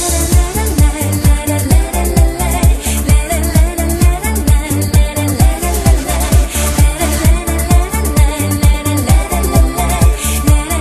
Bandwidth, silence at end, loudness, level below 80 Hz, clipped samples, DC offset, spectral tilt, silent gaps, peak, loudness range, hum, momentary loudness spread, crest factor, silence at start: 13.5 kHz; 0 s; -13 LUFS; -14 dBFS; under 0.1%; under 0.1%; -5 dB/octave; none; 0 dBFS; 0 LU; none; 2 LU; 10 dB; 0 s